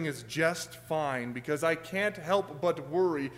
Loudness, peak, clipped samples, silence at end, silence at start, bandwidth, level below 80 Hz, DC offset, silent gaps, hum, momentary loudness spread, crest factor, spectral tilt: -31 LUFS; -14 dBFS; under 0.1%; 0 s; 0 s; 16 kHz; -66 dBFS; under 0.1%; none; none; 6 LU; 18 dB; -5 dB/octave